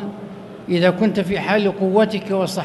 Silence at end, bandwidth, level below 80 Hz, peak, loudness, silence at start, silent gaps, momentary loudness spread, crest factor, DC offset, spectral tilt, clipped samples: 0 s; 12 kHz; -54 dBFS; -4 dBFS; -18 LUFS; 0 s; none; 17 LU; 16 dB; under 0.1%; -6.5 dB/octave; under 0.1%